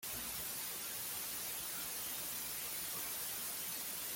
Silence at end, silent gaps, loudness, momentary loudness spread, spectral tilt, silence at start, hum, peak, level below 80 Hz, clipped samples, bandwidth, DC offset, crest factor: 0 s; none; -40 LUFS; 1 LU; 0 dB/octave; 0 s; none; -30 dBFS; -70 dBFS; under 0.1%; 17 kHz; under 0.1%; 14 dB